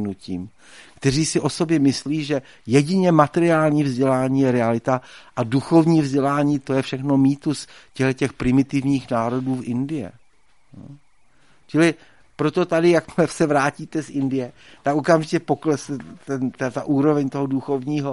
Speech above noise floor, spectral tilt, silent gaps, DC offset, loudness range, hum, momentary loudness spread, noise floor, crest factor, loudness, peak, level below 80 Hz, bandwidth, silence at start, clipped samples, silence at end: 41 dB; -6.5 dB/octave; none; 0.2%; 5 LU; none; 11 LU; -61 dBFS; 20 dB; -21 LUFS; 0 dBFS; -52 dBFS; 11.5 kHz; 0 s; under 0.1%; 0 s